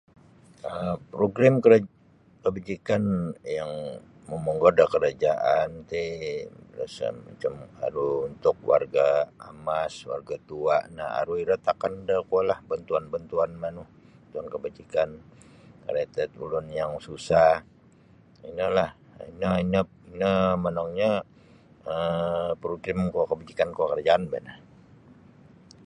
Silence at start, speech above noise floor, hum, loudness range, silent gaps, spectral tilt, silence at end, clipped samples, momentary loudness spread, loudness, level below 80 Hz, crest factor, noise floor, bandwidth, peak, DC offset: 0.65 s; 30 dB; none; 5 LU; none; -7 dB/octave; 1.3 s; under 0.1%; 15 LU; -26 LUFS; -54 dBFS; 22 dB; -56 dBFS; 10 kHz; -4 dBFS; under 0.1%